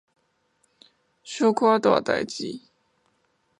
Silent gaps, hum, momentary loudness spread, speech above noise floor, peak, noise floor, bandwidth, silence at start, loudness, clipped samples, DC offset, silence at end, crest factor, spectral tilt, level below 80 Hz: none; none; 17 LU; 47 dB; -4 dBFS; -69 dBFS; 11 kHz; 1.25 s; -23 LUFS; under 0.1%; under 0.1%; 1 s; 22 dB; -4.5 dB/octave; -68 dBFS